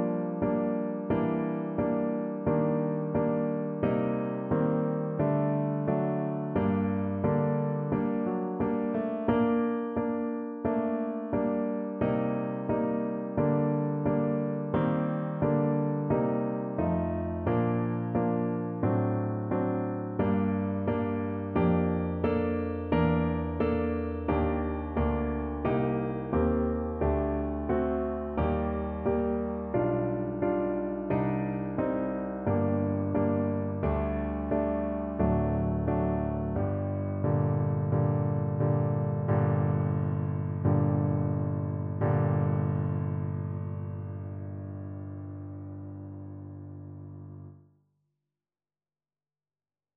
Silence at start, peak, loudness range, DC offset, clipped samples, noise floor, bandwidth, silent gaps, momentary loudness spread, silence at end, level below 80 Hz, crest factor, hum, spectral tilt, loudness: 0 s; -12 dBFS; 3 LU; under 0.1%; under 0.1%; under -90 dBFS; 4 kHz; none; 6 LU; 2.4 s; -44 dBFS; 16 dB; none; -9.5 dB/octave; -29 LUFS